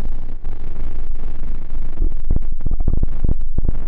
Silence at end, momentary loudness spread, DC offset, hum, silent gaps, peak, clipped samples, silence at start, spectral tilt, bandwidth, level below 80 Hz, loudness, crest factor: 0 s; 8 LU; under 0.1%; none; none; -8 dBFS; under 0.1%; 0 s; -10.5 dB/octave; 1.2 kHz; -16 dBFS; -27 LUFS; 2 dB